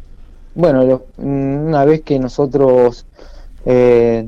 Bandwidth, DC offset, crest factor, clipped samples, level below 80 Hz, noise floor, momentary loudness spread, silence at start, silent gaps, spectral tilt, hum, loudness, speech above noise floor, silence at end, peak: 7.2 kHz; under 0.1%; 12 dB; under 0.1%; -34 dBFS; -36 dBFS; 8 LU; 0 s; none; -9 dB/octave; none; -13 LUFS; 23 dB; 0 s; -2 dBFS